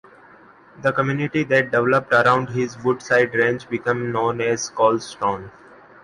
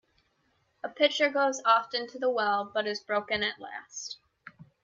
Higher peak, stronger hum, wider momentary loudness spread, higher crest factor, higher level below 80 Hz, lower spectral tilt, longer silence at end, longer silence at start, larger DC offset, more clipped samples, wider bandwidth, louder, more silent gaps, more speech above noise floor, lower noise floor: first, -4 dBFS vs -12 dBFS; neither; second, 8 LU vs 16 LU; about the same, 18 dB vs 18 dB; first, -58 dBFS vs -72 dBFS; first, -5.5 dB/octave vs -2 dB/octave; first, 0.55 s vs 0.2 s; about the same, 0.8 s vs 0.85 s; neither; neither; first, 11.5 kHz vs 7.8 kHz; first, -20 LUFS vs -28 LUFS; neither; second, 28 dB vs 43 dB; second, -48 dBFS vs -72 dBFS